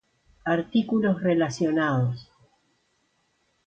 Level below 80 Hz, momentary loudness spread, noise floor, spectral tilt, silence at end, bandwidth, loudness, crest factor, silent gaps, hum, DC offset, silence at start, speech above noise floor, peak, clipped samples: -62 dBFS; 6 LU; -70 dBFS; -7 dB/octave; 1.45 s; 8.8 kHz; -25 LUFS; 16 dB; none; none; under 0.1%; 0.45 s; 47 dB; -10 dBFS; under 0.1%